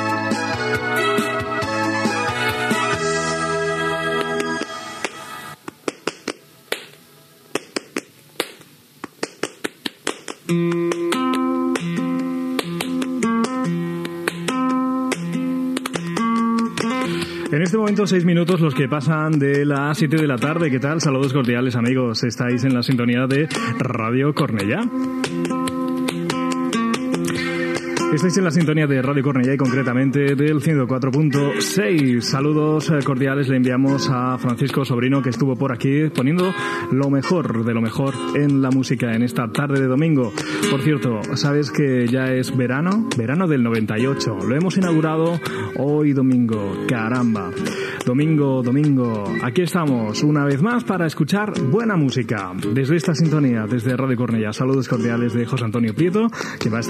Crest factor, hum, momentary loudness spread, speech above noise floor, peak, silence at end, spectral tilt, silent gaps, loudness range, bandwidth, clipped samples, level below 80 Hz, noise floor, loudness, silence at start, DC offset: 18 dB; none; 7 LU; 30 dB; -2 dBFS; 0 s; -6 dB/octave; none; 5 LU; 14.5 kHz; under 0.1%; -60 dBFS; -48 dBFS; -20 LUFS; 0 s; under 0.1%